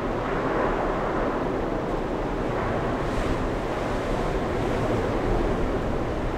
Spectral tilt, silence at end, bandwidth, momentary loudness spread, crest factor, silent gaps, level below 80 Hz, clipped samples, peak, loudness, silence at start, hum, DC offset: -7 dB/octave; 0 s; 13 kHz; 3 LU; 12 dB; none; -32 dBFS; under 0.1%; -12 dBFS; -27 LUFS; 0 s; none; under 0.1%